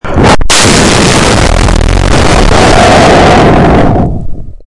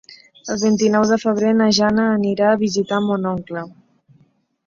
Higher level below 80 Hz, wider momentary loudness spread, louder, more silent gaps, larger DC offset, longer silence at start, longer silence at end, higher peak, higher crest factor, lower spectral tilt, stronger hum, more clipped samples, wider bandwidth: first, -12 dBFS vs -56 dBFS; second, 6 LU vs 13 LU; first, -5 LUFS vs -17 LUFS; neither; neither; about the same, 0.05 s vs 0.1 s; second, 0.05 s vs 0.95 s; first, 0 dBFS vs -4 dBFS; second, 4 dB vs 16 dB; about the same, -4.5 dB/octave vs -5 dB/octave; neither; first, 2% vs under 0.1%; first, 12 kHz vs 7.4 kHz